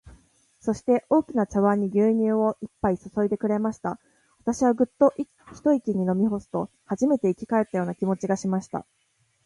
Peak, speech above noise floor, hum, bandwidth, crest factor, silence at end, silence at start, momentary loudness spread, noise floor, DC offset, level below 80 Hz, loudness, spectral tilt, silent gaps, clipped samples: -6 dBFS; 35 dB; none; 11.5 kHz; 18 dB; 0.65 s; 0.05 s; 11 LU; -59 dBFS; under 0.1%; -56 dBFS; -25 LUFS; -8 dB/octave; none; under 0.1%